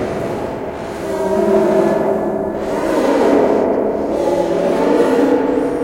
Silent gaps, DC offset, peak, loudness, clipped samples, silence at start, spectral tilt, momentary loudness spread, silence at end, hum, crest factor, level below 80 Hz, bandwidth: none; under 0.1%; 0 dBFS; -16 LUFS; under 0.1%; 0 s; -6.5 dB/octave; 9 LU; 0 s; none; 14 dB; -44 dBFS; 16.5 kHz